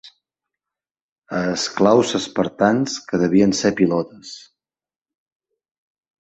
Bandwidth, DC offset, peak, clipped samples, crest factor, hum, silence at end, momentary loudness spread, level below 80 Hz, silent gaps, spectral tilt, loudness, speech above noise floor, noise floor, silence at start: 8.4 kHz; under 0.1%; -2 dBFS; under 0.1%; 20 dB; none; 1.8 s; 15 LU; -56 dBFS; 0.91-0.95 s, 1.01-1.22 s; -5 dB/octave; -19 LUFS; 70 dB; -89 dBFS; 0.05 s